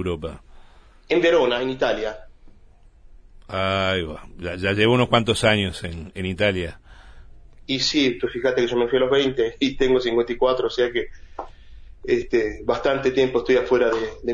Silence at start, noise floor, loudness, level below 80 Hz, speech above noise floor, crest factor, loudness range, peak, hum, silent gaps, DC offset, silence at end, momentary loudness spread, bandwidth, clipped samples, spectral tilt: 0 s; -50 dBFS; -21 LUFS; -42 dBFS; 28 dB; 20 dB; 3 LU; -2 dBFS; none; none; under 0.1%; 0 s; 14 LU; 11 kHz; under 0.1%; -5 dB/octave